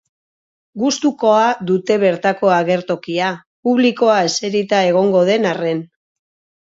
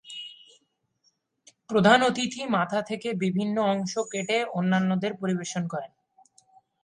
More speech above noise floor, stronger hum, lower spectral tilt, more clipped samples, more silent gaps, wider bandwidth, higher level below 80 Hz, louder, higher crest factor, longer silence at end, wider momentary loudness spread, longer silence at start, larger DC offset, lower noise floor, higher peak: first, over 75 dB vs 47 dB; neither; about the same, -5 dB/octave vs -5 dB/octave; neither; first, 3.46-3.63 s vs none; second, 8 kHz vs 10.5 kHz; about the same, -66 dBFS vs -70 dBFS; first, -16 LUFS vs -26 LUFS; second, 16 dB vs 22 dB; second, 0.8 s vs 0.95 s; second, 8 LU vs 14 LU; first, 0.75 s vs 0.05 s; neither; first, under -90 dBFS vs -72 dBFS; first, -2 dBFS vs -6 dBFS